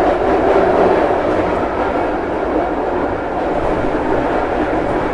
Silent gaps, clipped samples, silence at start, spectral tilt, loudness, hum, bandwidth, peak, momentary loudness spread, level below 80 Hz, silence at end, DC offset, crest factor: none; under 0.1%; 0 s; -7.5 dB/octave; -16 LUFS; none; 11 kHz; -2 dBFS; 6 LU; -32 dBFS; 0 s; under 0.1%; 14 dB